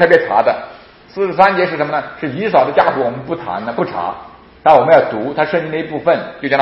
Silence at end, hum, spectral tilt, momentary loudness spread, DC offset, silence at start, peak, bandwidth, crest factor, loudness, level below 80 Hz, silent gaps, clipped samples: 0 s; none; -7.5 dB/octave; 13 LU; under 0.1%; 0 s; 0 dBFS; 6.2 kHz; 14 dB; -15 LUFS; -52 dBFS; none; 0.1%